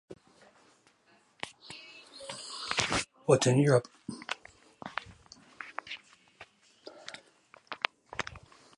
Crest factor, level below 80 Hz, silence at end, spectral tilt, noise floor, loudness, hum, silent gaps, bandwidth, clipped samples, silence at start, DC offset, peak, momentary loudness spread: 30 dB; -64 dBFS; 0.4 s; -4.5 dB/octave; -66 dBFS; -32 LUFS; none; none; 11.5 kHz; under 0.1%; 0.1 s; under 0.1%; -6 dBFS; 28 LU